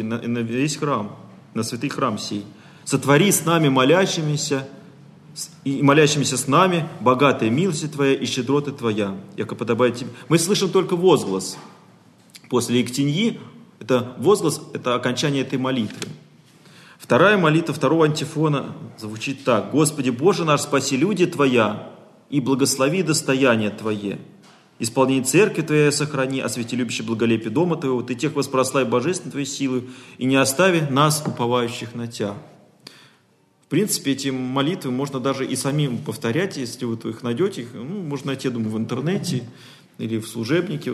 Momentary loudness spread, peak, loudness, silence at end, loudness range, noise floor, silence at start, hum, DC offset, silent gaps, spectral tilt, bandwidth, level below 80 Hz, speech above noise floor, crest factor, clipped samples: 12 LU; -2 dBFS; -21 LUFS; 0 s; 6 LU; -60 dBFS; 0 s; none; under 0.1%; none; -5 dB/octave; 13 kHz; -66 dBFS; 39 dB; 20 dB; under 0.1%